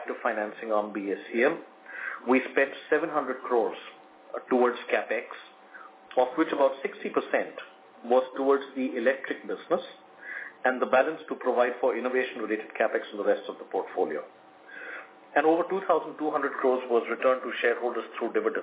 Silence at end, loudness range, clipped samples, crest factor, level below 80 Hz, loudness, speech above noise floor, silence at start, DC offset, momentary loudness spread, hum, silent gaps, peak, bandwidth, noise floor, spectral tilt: 0 s; 2 LU; under 0.1%; 20 dB; -86 dBFS; -28 LUFS; 22 dB; 0 s; under 0.1%; 16 LU; none; none; -8 dBFS; 4 kHz; -49 dBFS; -8 dB/octave